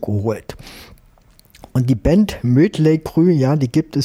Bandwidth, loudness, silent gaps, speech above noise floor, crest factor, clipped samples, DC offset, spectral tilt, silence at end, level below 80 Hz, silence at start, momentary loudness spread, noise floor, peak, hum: 15.5 kHz; -16 LUFS; none; 34 dB; 14 dB; under 0.1%; under 0.1%; -8 dB/octave; 0 s; -38 dBFS; 0 s; 15 LU; -50 dBFS; -4 dBFS; none